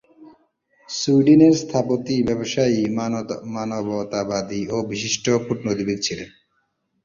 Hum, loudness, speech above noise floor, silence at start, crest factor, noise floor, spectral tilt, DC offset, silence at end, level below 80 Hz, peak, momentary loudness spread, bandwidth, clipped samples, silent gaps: none; -21 LUFS; 50 dB; 0.2 s; 18 dB; -70 dBFS; -5 dB/octave; under 0.1%; 0.75 s; -56 dBFS; -2 dBFS; 13 LU; 7.6 kHz; under 0.1%; none